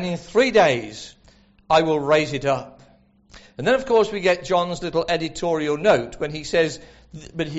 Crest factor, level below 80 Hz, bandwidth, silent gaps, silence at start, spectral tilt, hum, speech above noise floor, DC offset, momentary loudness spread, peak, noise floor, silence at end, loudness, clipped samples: 16 dB; -50 dBFS; 8 kHz; none; 0 s; -3.5 dB/octave; none; 34 dB; under 0.1%; 17 LU; -6 dBFS; -54 dBFS; 0 s; -21 LUFS; under 0.1%